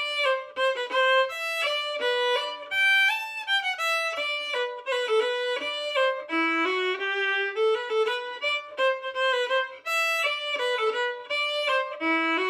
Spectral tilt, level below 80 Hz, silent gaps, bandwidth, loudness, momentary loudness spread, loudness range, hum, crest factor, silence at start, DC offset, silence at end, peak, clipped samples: 0 dB/octave; -82 dBFS; none; 15.5 kHz; -25 LUFS; 6 LU; 2 LU; none; 14 dB; 0 s; under 0.1%; 0 s; -12 dBFS; under 0.1%